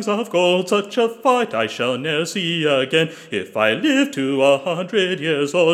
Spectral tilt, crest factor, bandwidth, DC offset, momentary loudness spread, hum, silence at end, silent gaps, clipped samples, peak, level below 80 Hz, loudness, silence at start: -4.5 dB/octave; 18 dB; 15.5 kHz; under 0.1%; 4 LU; none; 0 s; none; under 0.1%; -2 dBFS; -76 dBFS; -19 LUFS; 0 s